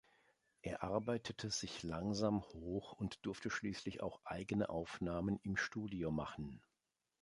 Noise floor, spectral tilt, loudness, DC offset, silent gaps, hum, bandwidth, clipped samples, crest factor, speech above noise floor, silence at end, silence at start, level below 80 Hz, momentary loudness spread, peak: -89 dBFS; -5 dB/octave; -43 LUFS; under 0.1%; none; none; 11.5 kHz; under 0.1%; 20 dB; 47 dB; 0.65 s; 0.65 s; -62 dBFS; 8 LU; -22 dBFS